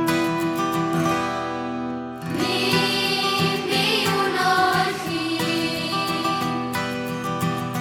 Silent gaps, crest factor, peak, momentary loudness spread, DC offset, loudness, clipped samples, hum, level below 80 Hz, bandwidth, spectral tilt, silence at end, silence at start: none; 16 dB; -6 dBFS; 8 LU; under 0.1%; -22 LUFS; under 0.1%; none; -58 dBFS; 18 kHz; -4 dB/octave; 0 s; 0 s